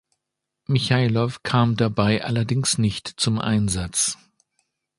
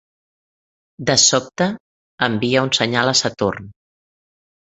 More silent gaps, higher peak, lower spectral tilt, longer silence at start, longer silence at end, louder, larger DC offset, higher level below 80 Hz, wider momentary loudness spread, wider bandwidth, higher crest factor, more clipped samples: second, none vs 1.80-2.18 s; about the same, -4 dBFS vs -2 dBFS; first, -4.5 dB/octave vs -2.5 dB/octave; second, 0.7 s vs 1 s; about the same, 0.85 s vs 0.95 s; second, -22 LUFS vs -17 LUFS; neither; first, -46 dBFS vs -54 dBFS; second, 5 LU vs 11 LU; first, 11.5 kHz vs 8.4 kHz; about the same, 20 dB vs 20 dB; neither